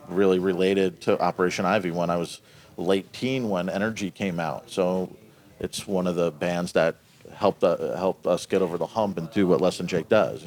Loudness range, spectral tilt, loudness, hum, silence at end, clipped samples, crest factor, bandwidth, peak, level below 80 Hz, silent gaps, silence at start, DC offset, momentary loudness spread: 3 LU; -6 dB/octave; -25 LUFS; none; 0 s; under 0.1%; 18 dB; 20 kHz; -6 dBFS; -62 dBFS; none; 0 s; under 0.1%; 8 LU